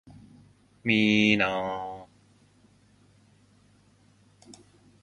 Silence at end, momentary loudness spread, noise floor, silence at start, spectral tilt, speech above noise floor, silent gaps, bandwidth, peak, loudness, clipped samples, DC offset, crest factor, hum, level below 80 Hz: 0.5 s; 18 LU; -61 dBFS; 0.05 s; -5 dB/octave; 37 dB; none; 9.2 kHz; -8 dBFS; -24 LUFS; under 0.1%; under 0.1%; 24 dB; none; -64 dBFS